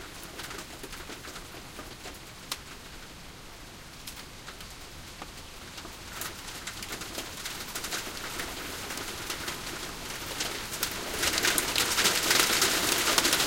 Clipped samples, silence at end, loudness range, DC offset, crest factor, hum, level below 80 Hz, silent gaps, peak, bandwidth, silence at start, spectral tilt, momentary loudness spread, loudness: under 0.1%; 0 s; 16 LU; under 0.1%; 28 dB; none; -50 dBFS; none; -4 dBFS; 17 kHz; 0 s; -1 dB/octave; 20 LU; -29 LUFS